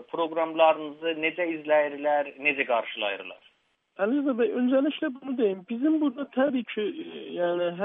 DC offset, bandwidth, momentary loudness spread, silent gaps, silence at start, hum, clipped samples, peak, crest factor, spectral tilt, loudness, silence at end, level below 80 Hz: under 0.1%; 3.9 kHz; 8 LU; none; 0 s; none; under 0.1%; -8 dBFS; 20 dB; -8.5 dB/octave; -27 LUFS; 0 s; -82 dBFS